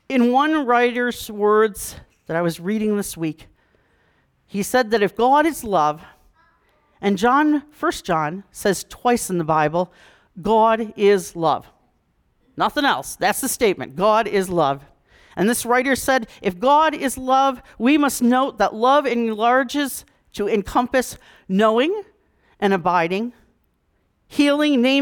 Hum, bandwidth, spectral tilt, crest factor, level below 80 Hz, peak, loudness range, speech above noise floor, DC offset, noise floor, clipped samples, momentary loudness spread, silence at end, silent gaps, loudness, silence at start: none; 19.5 kHz; -4.5 dB/octave; 14 dB; -52 dBFS; -6 dBFS; 4 LU; 47 dB; under 0.1%; -66 dBFS; under 0.1%; 11 LU; 0 s; none; -19 LUFS; 0.1 s